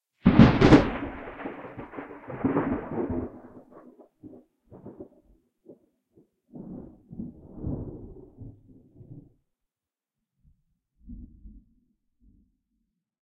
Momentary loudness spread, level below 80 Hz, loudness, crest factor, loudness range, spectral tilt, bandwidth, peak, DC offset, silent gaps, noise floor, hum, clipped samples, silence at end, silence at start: 30 LU; -44 dBFS; -23 LUFS; 28 dB; 27 LU; -8 dB/octave; 8.4 kHz; -2 dBFS; under 0.1%; none; under -90 dBFS; none; under 0.1%; 1.8 s; 0.25 s